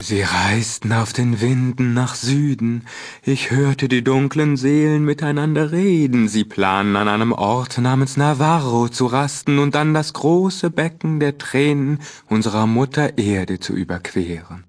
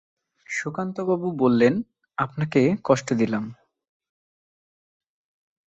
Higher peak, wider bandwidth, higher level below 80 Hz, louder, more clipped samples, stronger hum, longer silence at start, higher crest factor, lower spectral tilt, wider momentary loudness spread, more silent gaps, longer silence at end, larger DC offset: first, 0 dBFS vs -6 dBFS; first, 11 kHz vs 8.2 kHz; first, -52 dBFS vs -64 dBFS; first, -18 LUFS vs -23 LUFS; neither; neither; second, 0 s vs 0.5 s; about the same, 16 dB vs 20 dB; about the same, -6 dB/octave vs -6.5 dB/octave; second, 7 LU vs 10 LU; neither; second, 0.05 s vs 2.15 s; neither